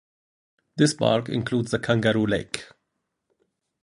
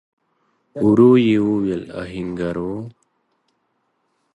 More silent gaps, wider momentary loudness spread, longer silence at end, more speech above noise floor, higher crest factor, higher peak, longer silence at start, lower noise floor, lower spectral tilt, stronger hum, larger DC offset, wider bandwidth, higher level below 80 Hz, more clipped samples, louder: neither; second, 12 LU vs 19 LU; second, 1.2 s vs 1.45 s; first, 56 dB vs 52 dB; about the same, 22 dB vs 18 dB; about the same, -4 dBFS vs -2 dBFS; about the same, 0.75 s vs 0.75 s; first, -79 dBFS vs -69 dBFS; second, -5.5 dB/octave vs -8.5 dB/octave; neither; neither; first, 11.5 kHz vs 8.8 kHz; about the same, -56 dBFS vs -52 dBFS; neither; second, -23 LUFS vs -18 LUFS